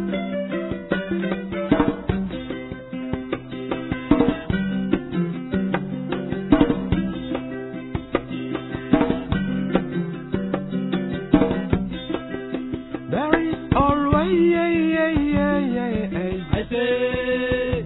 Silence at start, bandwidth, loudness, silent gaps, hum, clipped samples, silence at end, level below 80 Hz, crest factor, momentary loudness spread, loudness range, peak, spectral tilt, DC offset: 0 s; 4.1 kHz; -23 LUFS; none; none; under 0.1%; 0 s; -38 dBFS; 22 dB; 10 LU; 5 LU; -2 dBFS; -11 dB/octave; under 0.1%